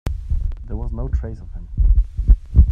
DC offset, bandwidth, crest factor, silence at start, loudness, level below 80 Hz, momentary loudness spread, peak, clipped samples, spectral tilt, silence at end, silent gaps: under 0.1%; 2.3 kHz; 16 dB; 0.05 s; -22 LUFS; -18 dBFS; 13 LU; 0 dBFS; under 0.1%; -9.5 dB/octave; 0 s; none